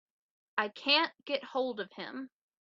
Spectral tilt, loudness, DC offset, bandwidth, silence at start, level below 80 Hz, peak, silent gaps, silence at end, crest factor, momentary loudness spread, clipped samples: 1 dB/octave; -32 LUFS; under 0.1%; 7.4 kHz; 0.55 s; -86 dBFS; -12 dBFS; none; 0.35 s; 24 dB; 16 LU; under 0.1%